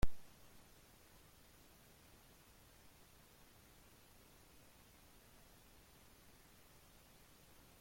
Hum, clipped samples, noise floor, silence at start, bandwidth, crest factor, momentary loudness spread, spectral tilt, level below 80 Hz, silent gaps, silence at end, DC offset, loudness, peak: none; under 0.1%; -65 dBFS; 0.05 s; 16.5 kHz; 24 dB; 0 LU; -4.5 dB/octave; -56 dBFS; none; 7.6 s; under 0.1%; -63 LUFS; -22 dBFS